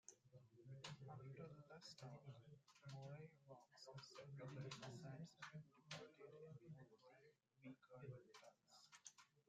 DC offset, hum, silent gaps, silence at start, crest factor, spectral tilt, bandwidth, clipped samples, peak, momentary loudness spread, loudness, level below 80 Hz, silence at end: under 0.1%; none; none; 0.1 s; 20 dB; -5 dB/octave; 12 kHz; under 0.1%; -40 dBFS; 10 LU; -61 LUFS; -90 dBFS; 0.05 s